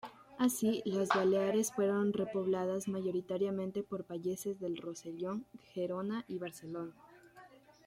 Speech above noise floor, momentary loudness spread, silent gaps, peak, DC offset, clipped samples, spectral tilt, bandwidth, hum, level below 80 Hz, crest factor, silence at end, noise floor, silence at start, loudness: 24 dB; 13 LU; none; -14 dBFS; under 0.1%; under 0.1%; -5.5 dB/octave; 16.5 kHz; none; -76 dBFS; 22 dB; 0.4 s; -59 dBFS; 0.05 s; -36 LUFS